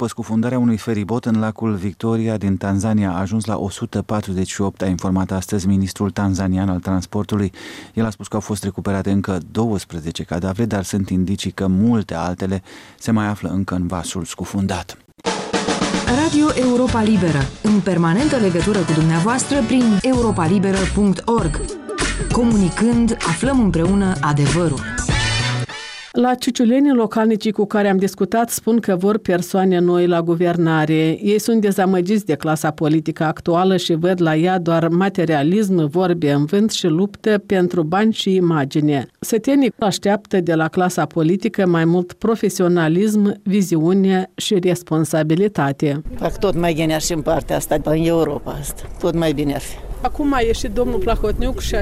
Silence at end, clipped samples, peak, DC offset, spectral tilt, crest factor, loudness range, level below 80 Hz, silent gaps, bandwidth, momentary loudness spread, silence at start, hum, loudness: 0 s; under 0.1%; -6 dBFS; under 0.1%; -6 dB/octave; 10 dB; 4 LU; -34 dBFS; none; 15.5 kHz; 7 LU; 0 s; none; -18 LUFS